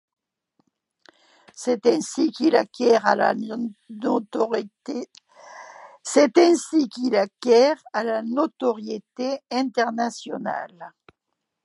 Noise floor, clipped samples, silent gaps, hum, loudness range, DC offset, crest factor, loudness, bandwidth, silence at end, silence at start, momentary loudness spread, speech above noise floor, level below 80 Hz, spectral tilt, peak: -80 dBFS; under 0.1%; none; none; 6 LU; under 0.1%; 20 dB; -22 LUFS; 11.5 kHz; 0.75 s; 1.55 s; 15 LU; 58 dB; -78 dBFS; -4 dB/octave; -4 dBFS